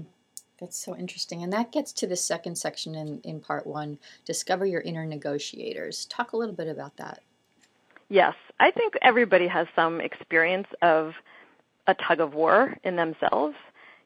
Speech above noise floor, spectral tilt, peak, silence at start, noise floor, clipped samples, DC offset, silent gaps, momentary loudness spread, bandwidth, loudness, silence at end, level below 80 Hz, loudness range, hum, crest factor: 39 dB; -3.5 dB/octave; -4 dBFS; 0 s; -65 dBFS; under 0.1%; under 0.1%; none; 17 LU; 16 kHz; -26 LUFS; 0.45 s; -78 dBFS; 9 LU; none; 24 dB